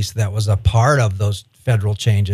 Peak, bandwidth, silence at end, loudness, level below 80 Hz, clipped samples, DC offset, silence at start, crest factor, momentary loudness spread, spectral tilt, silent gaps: -2 dBFS; 13.5 kHz; 0 s; -18 LUFS; -34 dBFS; under 0.1%; under 0.1%; 0 s; 14 dB; 8 LU; -5.5 dB/octave; none